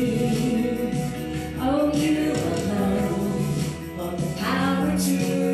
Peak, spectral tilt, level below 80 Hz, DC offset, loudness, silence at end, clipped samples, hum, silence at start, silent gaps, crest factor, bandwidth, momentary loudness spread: -12 dBFS; -6 dB/octave; -44 dBFS; under 0.1%; -24 LUFS; 0 s; under 0.1%; none; 0 s; none; 12 dB; 14.5 kHz; 7 LU